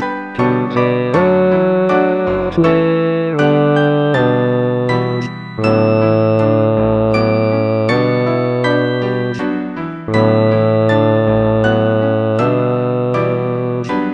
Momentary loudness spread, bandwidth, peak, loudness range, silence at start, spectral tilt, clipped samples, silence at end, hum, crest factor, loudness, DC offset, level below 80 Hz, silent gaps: 6 LU; 8.4 kHz; 0 dBFS; 2 LU; 0 s; -8.5 dB/octave; under 0.1%; 0 s; none; 14 dB; -14 LUFS; 0.2%; -42 dBFS; none